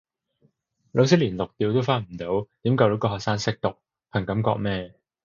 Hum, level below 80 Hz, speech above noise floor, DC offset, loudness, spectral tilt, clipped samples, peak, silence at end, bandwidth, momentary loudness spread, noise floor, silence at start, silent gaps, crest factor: none; -52 dBFS; 43 dB; under 0.1%; -24 LUFS; -6.5 dB/octave; under 0.1%; -4 dBFS; 0.35 s; 7.4 kHz; 10 LU; -66 dBFS; 0.95 s; none; 22 dB